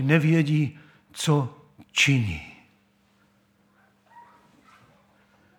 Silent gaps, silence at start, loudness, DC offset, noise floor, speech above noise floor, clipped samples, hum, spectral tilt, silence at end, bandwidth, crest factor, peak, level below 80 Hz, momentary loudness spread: none; 0 s; -24 LUFS; under 0.1%; -64 dBFS; 41 dB; under 0.1%; none; -5 dB/octave; 1.4 s; 17 kHz; 22 dB; -6 dBFS; -56 dBFS; 17 LU